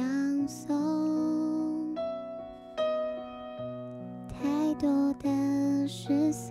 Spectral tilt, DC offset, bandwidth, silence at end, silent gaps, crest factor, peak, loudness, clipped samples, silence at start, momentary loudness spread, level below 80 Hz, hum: -6 dB/octave; under 0.1%; 13 kHz; 0 s; none; 12 dB; -18 dBFS; -30 LUFS; under 0.1%; 0 s; 13 LU; -60 dBFS; none